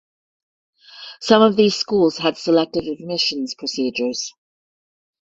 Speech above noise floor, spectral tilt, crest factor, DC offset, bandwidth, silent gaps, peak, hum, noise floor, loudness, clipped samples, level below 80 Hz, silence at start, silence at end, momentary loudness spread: over 72 dB; -4 dB/octave; 20 dB; under 0.1%; 7.8 kHz; none; -2 dBFS; none; under -90 dBFS; -19 LUFS; under 0.1%; -60 dBFS; 0.95 s; 0.9 s; 14 LU